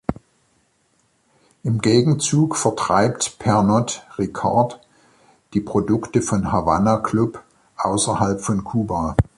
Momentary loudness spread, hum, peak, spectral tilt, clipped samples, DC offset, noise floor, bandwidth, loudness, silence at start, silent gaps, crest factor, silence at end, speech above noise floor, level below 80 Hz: 9 LU; none; -2 dBFS; -5.5 dB/octave; under 0.1%; under 0.1%; -64 dBFS; 11.5 kHz; -20 LUFS; 0.1 s; none; 18 dB; 0.15 s; 45 dB; -42 dBFS